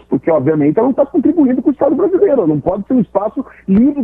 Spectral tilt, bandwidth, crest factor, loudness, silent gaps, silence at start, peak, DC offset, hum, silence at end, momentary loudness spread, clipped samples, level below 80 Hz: -12 dB/octave; 3.4 kHz; 12 dB; -13 LUFS; none; 0.1 s; 0 dBFS; under 0.1%; none; 0 s; 5 LU; under 0.1%; -44 dBFS